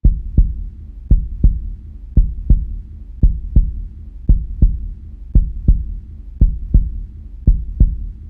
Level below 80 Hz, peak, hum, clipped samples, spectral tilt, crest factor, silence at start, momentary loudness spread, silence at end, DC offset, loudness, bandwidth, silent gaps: -16 dBFS; 0 dBFS; none; under 0.1%; -13.5 dB/octave; 16 dB; 0.05 s; 16 LU; 0 s; under 0.1%; -19 LUFS; 0.8 kHz; none